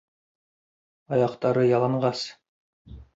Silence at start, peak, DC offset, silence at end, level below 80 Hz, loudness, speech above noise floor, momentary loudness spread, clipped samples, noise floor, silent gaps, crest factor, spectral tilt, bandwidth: 1.1 s; -10 dBFS; under 0.1%; 0.1 s; -56 dBFS; -24 LUFS; over 66 dB; 10 LU; under 0.1%; under -90 dBFS; 2.49-2.85 s; 18 dB; -7 dB/octave; 8 kHz